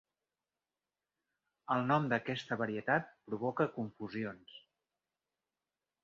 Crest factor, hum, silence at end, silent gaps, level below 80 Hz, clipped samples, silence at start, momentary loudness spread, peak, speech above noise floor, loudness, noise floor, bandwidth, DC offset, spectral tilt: 22 dB; none; 1.45 s; none; -78 dBFS; under 0.1%; 1.7 s; 13 LU; -16 dBFS; over 54 dB; -36 LUFS; under -90 dBFS; 7.2 kHz; under 0.1%; -4.5 dB/octave